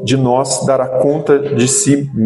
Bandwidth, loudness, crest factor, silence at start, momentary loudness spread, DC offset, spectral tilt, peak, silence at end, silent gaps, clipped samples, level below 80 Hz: 12 kHz; -13 LUFS; 12 dB; 0 s; 3 LU; under 0.1%; -5 dB/octave; 0 dBFS; 0 s; none; under 0.1%; -50 dBFS